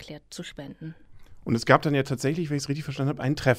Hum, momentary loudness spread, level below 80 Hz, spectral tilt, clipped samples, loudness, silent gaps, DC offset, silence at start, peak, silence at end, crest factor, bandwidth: none; 20 LU; -52 dBFS; -6 dB/octave; under 0.1%; -25 LUFS; none; under 0.1%; 0 s; -2 dBFS; 0 s; 24 dB; 15 kHz